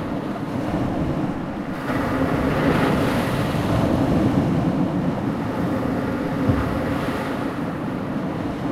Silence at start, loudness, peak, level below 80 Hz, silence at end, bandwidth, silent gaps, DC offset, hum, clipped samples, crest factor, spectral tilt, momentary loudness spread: 0 s; -23 LUFS; -6 dBFS; -38 dBFS; 0 s; 15.5 kHz; none; under 0.1%; none; under 0.1%; 16 dB; -7.5 dB/octave; 7 LU